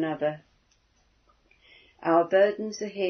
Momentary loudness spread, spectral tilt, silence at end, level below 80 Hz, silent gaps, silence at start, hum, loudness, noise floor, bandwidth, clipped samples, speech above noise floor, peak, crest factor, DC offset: 12 LU; -5.5 dB/octave; 0 s; -70 dBFS; none; 0 s; none; -25 LUFS; -66 dBFS; 6.6 kHz; under 0.1%; 41 dB; -8 dBFS; 20 dB; under 0.1%